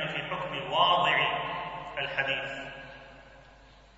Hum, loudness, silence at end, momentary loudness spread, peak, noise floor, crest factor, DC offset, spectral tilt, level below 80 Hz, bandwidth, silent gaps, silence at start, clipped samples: none; -28 LUFS; 0.3 s; 19 LU; -10 dBFS; -55 dBFS; 20 dB; under 0.1%; -4 dB/octave; -60 dBFS; 8 kHz; none; 0 s; under 0.1%